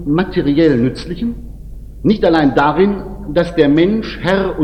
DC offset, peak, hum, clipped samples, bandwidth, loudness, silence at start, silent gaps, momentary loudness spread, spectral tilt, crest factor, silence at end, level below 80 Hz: under 0.1%; 0 dBFS; none; under 0.1%; 9 kHz; -14 LUFS; 0 s; none; 11 LU; -8 dB/octave; 14 dB; 0 s; -32 dBFS